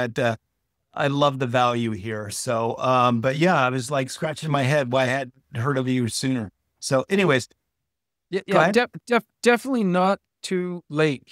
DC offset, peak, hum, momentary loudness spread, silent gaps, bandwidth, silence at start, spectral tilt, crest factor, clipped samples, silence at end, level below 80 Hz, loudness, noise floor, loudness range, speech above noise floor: under 0.1%; -2 dBFS; none; 10 LU; none; 15.5 kHz; 0 s; -5.5 dB/octave; 20 dB; under 0.1%; 0.15 s; -64 dBFS; -23 LUFS; -83 dBFS; 2 LU; 61 dB